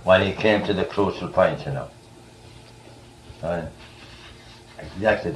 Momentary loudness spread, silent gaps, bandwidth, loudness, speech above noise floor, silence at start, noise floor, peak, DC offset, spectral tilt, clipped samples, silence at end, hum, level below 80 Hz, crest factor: 23 LU; none; 12 kHz; -23 LUFS; 25 dB; 0 s; -47 dBFS; -4 dBFS; under 0.1%; -6.5 dB/octave; under 0.1%; 0 s; none; -50 dBFS; 20 dB